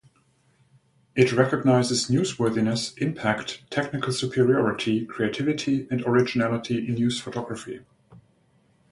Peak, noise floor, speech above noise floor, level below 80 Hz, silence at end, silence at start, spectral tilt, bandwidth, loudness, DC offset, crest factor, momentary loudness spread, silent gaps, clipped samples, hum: -4 dBFS; -64 dBFS; 40 dB; -60 dBFS; 0.75 s; 1.15 s; -5.5 dB/octave; 11.5 kHz; -24 LUFS; under 0.1%; 20 dB; 10 LU; none; under 0.1%; none